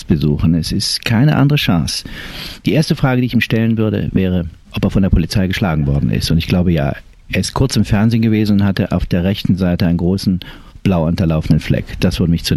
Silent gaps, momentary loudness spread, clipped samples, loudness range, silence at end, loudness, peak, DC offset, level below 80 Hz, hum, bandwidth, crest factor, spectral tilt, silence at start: none; 8 LU; under 0.1%; 1 LU; 0 s; -15 LUFS; -2 dBFS; 0.2%; -28 dBFS; none; 14.5 kHz; 14 dB; -6.5 dB/octave; 0 s